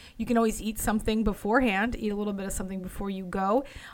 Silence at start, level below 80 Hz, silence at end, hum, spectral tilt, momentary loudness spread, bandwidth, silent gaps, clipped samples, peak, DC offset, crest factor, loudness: 0 s; -42 dBFS; 0 s; none; -5 dB/octave; 10 LU; 18 kHz; none; under 0.1%; -12 dBFS; under 0.1%; 16 dB; -28 LUFS